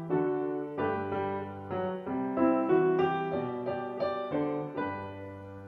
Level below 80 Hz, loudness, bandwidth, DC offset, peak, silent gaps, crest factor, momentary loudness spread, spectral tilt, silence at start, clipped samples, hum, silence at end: -68 dBFS; -31 LUFS; 5.2 kHz; under 0.1%; -14 dBFS; none; 16 dB; 11 LU; -9.5 dB/octave; 0 s; under 0.1%; none; 0 s